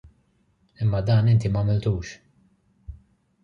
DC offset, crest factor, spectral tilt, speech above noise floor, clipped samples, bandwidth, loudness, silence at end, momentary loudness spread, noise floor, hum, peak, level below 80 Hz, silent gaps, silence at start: under 0.1%; 16 dB; -8 dB/octave; 44 dB; under 0.1%; 7.2 kHz; -23 LUFS; 0.5 s; 26 LU; -65 dBFS; none; -10 dBFS; -44 dBFS; none; 0.8 s